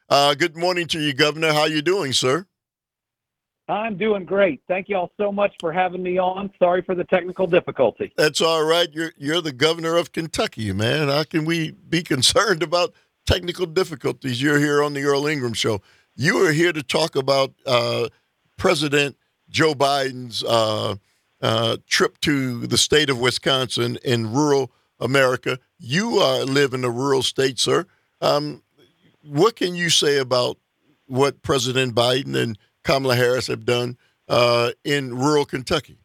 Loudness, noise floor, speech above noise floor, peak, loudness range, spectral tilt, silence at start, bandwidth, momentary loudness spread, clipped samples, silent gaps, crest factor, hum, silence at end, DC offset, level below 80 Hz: -20 LUFS; -87 dBFS; 67 dB; -4 dBFS; 2 LU; -4 dB/octave; 0.1 s; 16.5 kHz; 8 LU; under 0.1%; none; 18 dB; none; 0.25 s; under 0.1%; -50 dBFS